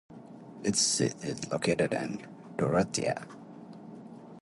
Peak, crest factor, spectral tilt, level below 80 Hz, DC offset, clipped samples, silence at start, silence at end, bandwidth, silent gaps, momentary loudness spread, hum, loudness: -12 dBFS; 20 dB; -3.5 dB/octave; -62 dBFS; under 0.1%; under 0.1%; 0.1 s; 0 s; 11.5 kHz; none; 22 LU; none; -30 LUFS